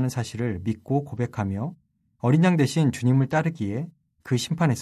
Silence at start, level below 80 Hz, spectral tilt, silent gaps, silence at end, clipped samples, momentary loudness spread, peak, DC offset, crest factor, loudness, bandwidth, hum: 0 s; -52 dBFS; -6.5 dB/octave; none; 0 s; under 0.1%; 10 LU; -8 dBFS; under 0.1%; 16 dB; -25 LUFS; 14 kHz; none